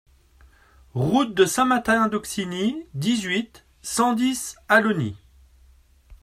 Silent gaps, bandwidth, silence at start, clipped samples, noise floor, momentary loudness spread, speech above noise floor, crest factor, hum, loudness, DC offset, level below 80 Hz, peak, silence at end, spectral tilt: none; 15 kHz; 0.95 s; under 0.1%; -55 dBFS; 11 LU; 33 dB; 20 dB; none; -22 LUFS; under 0.1%; -54 dBFS; -4 dBFS; 0.05 s; -4.5 dB/octave